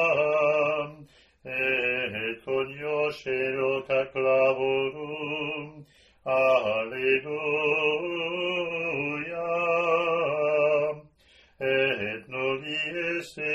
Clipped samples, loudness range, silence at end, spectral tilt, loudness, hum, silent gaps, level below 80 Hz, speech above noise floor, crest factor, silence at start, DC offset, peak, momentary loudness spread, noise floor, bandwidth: under 0.1%; 2 LU; 0 s; -5.5 dB/octave; -26 LUFS; none; none; -66 dBFS; 33 dB; 16 dB; 0 s; under 0.1%; -10 dBFS; 9 LU; -59 dBFS; 12.5 kHz